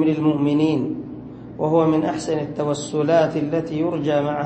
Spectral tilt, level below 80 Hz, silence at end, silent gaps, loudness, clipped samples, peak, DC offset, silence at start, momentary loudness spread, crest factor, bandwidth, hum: -7 dB/octave; -54 dBFS; 0 s; none; -21 LUFS; under 0.1%; -6 dBFS; under 0.1%; 0 s; 10 LU; 16 dB; 8.8 kHz; none